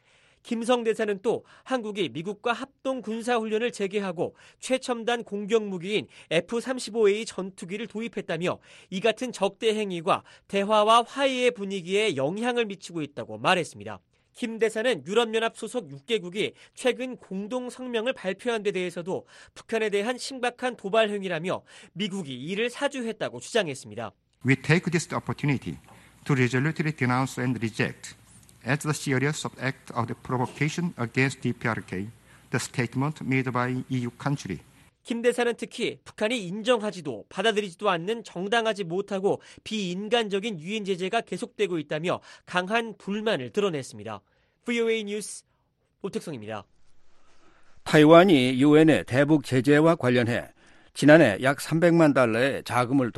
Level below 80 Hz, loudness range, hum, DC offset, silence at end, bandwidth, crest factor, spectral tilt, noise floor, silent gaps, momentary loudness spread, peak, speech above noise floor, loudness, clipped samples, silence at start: -64 dBFS; 9 LU; none; under 0.1%; 0.05 s; 12.5 kHz; 24 dB; -5.5 dB/octave; -71 dBFS; none; 14 LU; -2 dBFS; 45 dB; -26 LUFS; under 0.1%; 0.45 s